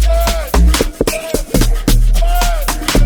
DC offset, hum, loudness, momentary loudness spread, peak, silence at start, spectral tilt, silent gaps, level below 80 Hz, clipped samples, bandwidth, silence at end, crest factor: under 0.1%; none; -15 LUFS; 4 LU; 0 dBFS; 0 s; -4.5 dB/octave; none; -12 dBFS; under 0.1%; 19.5 kHz; 0 s; 12 dB